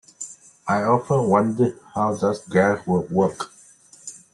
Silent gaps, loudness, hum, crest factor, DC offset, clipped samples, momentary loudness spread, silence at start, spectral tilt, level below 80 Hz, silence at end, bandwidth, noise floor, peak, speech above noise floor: none; -21 LUFS; none; 18 dB; under 0.1%; under 0.1%; 17 LU; 0.2 s; -6.5 dB/octave; -62 dBFS; 0.15 s; 11.5 kHz; -50 dBFS; -4 dBFS; 30 dB